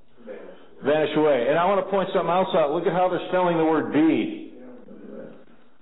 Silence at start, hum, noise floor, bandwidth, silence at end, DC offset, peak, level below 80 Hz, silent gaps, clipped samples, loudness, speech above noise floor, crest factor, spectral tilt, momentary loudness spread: 0.25 s; none; -51 dBFS; 4.1 kHz; 0.5 s; 0.6%; -12 dBFS; -66 dBFS; none; under 0.1%; -22 LUFS; 30 dB; 12 dB; -11 dB/octave; 21 LU